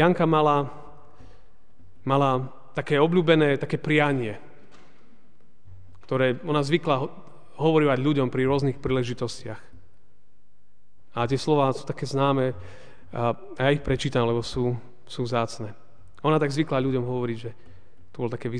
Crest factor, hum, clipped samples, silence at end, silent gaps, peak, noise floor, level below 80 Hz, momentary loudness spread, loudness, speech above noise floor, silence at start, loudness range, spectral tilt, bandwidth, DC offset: 20 dB; none; under 0.1%; 0 s; none; -6 dBFS; -68 dBFS; -52 dBFS; 15 LU; -25 LUFS; 45 dB; 0 s; 5 LU; -7 dB/octave; 10 kHz; 1%